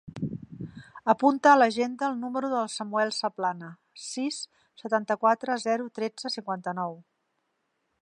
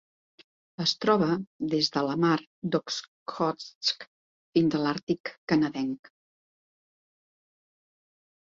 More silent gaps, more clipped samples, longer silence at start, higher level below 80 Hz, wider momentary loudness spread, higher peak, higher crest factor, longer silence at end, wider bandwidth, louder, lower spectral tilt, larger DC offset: second, none vs 1.47-1.59 s, 2.47-2.62 s, 3.08-3.26 s, 3.75-3.81 s, 4.07-4.53 s, 5.03-5.07 s, 5.20-5.24 s, 5.38-5.47 s; neither; second, 0.05 s vs 0.8 s; about the same, -68 dBFS vs -68 dBFS; first, 20 LU vs 10 LU; about the same, -6 dBFS vs -8 dBFS; about the same, 22 dB vs 22 dB; second, 1 s vs 2.5 s; first, 11 kHz vs 7.8 kHz; about the same, -27 LUFS vs -28 LUFS; about the same, -4.5 dB/octave vs -5 dB/octave; neither